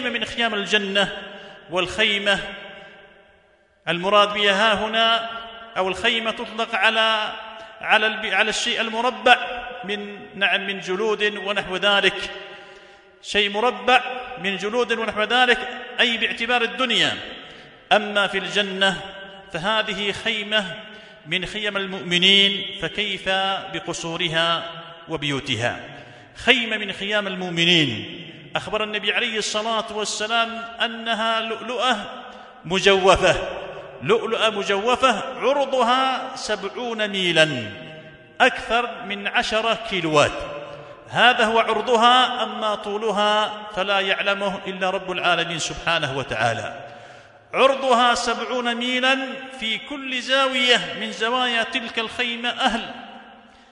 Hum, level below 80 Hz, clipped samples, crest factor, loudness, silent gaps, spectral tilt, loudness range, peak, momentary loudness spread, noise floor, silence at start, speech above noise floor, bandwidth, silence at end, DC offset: none; -52 dBFS; under 0.1%; 22 dB; -20 LUFS; none; -3 dB/octave; 3 LU; 0 dBFS; 15 LU; -58 dBFS; 0 s; 36 dB; 11 kHz; 0.35 s; under 0.1%